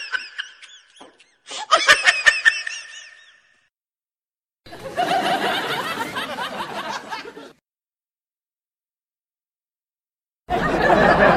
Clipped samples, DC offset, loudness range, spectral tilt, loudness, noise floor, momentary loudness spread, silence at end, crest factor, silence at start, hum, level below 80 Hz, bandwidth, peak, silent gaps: under 0.1%; under 0.1%; 15 LU; -3 dB/octave; -19 LUFS; under -90 dBFS; 19 LU; 0 s; 22 dB; 0 s; none; -46 dBFS; 16 kHz; 0 dBFS; none